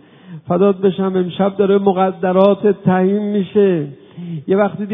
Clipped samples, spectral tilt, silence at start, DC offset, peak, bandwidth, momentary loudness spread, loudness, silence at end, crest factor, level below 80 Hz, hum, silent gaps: under 0.1%; -11.5 dB/octave; 0.3 s; under 0.1%; 0 dBFS; 3.8 kHz; 12 LU; -15 LUFS; 0 s; 16 dB; -60 dBFS; none; none